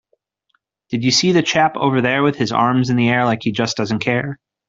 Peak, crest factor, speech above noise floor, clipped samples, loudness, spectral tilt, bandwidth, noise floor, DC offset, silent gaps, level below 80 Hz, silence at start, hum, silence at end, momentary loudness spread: -2 dBFS; 16 dB; 51 dB; under 0.1%; -17 LUFS; -4.5 dB/octave; 7.6 kHz; -67 dBFS; under 0.1%; none; -56 dBFS; 0.9 s; none; 0.35 s; 6 LU